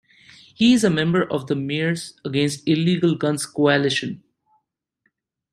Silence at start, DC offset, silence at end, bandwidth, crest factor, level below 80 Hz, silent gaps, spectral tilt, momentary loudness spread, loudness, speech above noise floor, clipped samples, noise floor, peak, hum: 0.6 s; under 0.1%; 1.35 s; 13.5 kHz; 18 dB; -60 dBFS; none; -5.5 dB/octave; 8 LU; -20 LUFS; 51 dB; under 0.1%; -71 dBFS; -4 dBFS; none